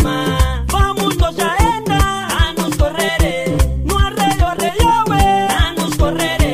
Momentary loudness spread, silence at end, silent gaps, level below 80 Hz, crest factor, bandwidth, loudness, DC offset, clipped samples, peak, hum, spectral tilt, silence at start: 4 LU; 0 s; none; -20 dBFS; 12 dB; 16 kHz; -15 LUFS; under 0.1%; under 0.1%; -2 dBFS; none; -5 dB/octave; 0 s